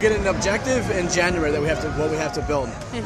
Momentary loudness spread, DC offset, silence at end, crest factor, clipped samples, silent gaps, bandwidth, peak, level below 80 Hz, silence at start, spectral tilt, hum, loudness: 5 LU; under 0.1%; 0 s; 16 dB; under 0.1%; none; 14 kHz; -6 dBFS; -36 dBFS; 0 s; -4.5 dB/octave; none; -22 LUFS